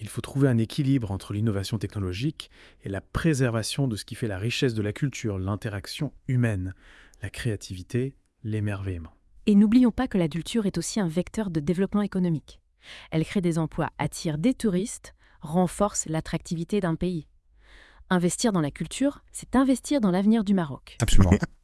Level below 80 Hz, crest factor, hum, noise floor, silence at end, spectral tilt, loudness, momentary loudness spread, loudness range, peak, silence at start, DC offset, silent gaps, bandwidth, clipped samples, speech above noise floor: -38 dBFS; 22 dB; none; -54 dBFS; 0.15 s; -6 dB/octave; -26 LUFS; 12 LU; 5 LU; -4 dBFS; 0 s; under 0.1%; none; 12 kHz; under 0.1%; 29 dB